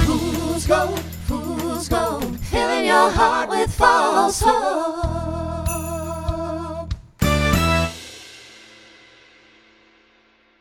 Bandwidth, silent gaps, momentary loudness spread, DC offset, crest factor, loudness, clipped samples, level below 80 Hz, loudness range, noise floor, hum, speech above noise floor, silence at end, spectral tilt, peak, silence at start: over 20 kHz; none; 13 LU; under 0.1%; 20 dB; -20 LUFS; under 0.1%; -32 dBFS; 6 LU; -57 dBFS; none; 40 dB; 1.95 s; -4.5 dB/octave; 0 dBFS; 0 s